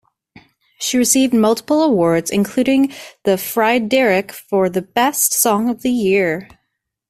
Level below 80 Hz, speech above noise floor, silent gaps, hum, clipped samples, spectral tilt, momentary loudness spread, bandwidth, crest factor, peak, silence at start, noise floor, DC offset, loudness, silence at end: -56 dBFS; 58 dB; none; none; under 0.1%; -3.5 dB/octave; 7 LU; 16 kHz; 16 dB; 0 dBFS; 0.8 s; -73 dBFS; under 0.1%; -16 LUFS; 0.65 s